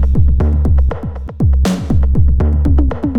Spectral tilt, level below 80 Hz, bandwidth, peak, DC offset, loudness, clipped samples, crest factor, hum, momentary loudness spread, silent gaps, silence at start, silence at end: -8.5 dB/octave; -14 dBFS; 8.6 kHz; 0 dBFS; under 0.1%; -14 LUFS; under 0.1%; 10 dB; none; 5 LU; none; 0 s; 0 s